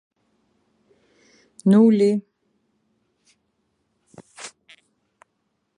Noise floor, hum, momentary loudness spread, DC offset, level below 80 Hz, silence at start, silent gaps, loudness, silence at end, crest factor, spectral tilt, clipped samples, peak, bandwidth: -73 dBFS; none; 24 LU; under 0.1%; -74 dBFS; 1.65 s; none; -18 LUFS; 1.3 s; 20 dB; -8 dB/octave; under 0.1%; -6 dBFS; 10.5 kHz